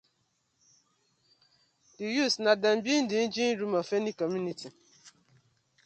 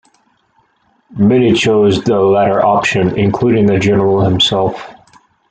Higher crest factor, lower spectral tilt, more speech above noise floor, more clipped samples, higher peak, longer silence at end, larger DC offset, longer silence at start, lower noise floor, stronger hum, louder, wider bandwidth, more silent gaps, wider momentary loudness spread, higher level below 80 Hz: first, 22 dB vs 12 dB; second, -4 dB/octave vs -6 dB/octave; about the same, 47 dB vs 46 dB; neither; second, -10 dBFS vs 0 dBFS; first, 0.75 s vs 0.6 s; neither; first, 2 s vs 1.1 s; first, -75 dBFS vs -57 dBFS; neither; second, -29 LUFS vs -12 LUFS; about the same, 8.8 kHz vs 9 kHz; neither; first, 13 LU vs 4 LU; second, -78 dBFS vs -44 dBFS